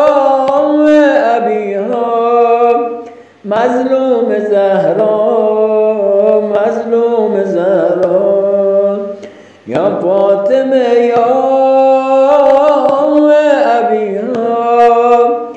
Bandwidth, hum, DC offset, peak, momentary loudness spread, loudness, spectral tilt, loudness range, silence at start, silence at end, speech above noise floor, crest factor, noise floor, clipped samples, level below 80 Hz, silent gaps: 8.2 kHz; none; under 0.1%; 0 dBFS; 7 LU; -10 LUFS; -6.5 dB/octave; 3 LU; 0 s; 0 s; 23 dB; 10 dB; -32 dBFS; under 0.1%; -58 dBFS; none